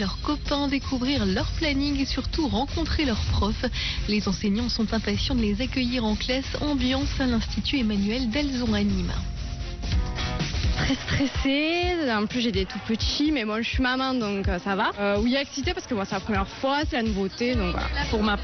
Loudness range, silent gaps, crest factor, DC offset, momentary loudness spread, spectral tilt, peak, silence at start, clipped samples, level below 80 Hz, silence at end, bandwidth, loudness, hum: 2 LU; none; 10 dB; under 0.1%; 4 LU; -4 dB/octave; -14 dBFS; 0 s; under 0.1%; -34 dBFS; 0 s; 6.6 kHz; -26 LUFS; none